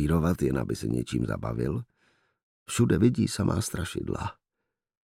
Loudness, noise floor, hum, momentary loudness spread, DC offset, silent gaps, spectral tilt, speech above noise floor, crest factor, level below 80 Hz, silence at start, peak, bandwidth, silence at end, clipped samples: -28 LUFS; -85 dBFS; none; 11 LU; under 0.1%; 2.43-2.66 s; -6 dB/octave; 58 dB; 18 dB; -46 dBFS; 0 s; -10 dBFS; 16 kHz; 0.7 s; under 0.1%